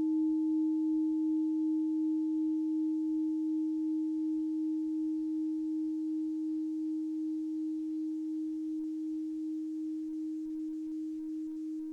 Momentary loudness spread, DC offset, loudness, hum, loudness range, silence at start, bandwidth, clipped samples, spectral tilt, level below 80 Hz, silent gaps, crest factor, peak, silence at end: 7 LU; under 0.1%; -34 LUFS; none; 6 LU; 0 s; 1 kHz; under 0.1%; -7 dB/octave; -76 dBFS; none; 8 dB; -26 dBFS; 0 s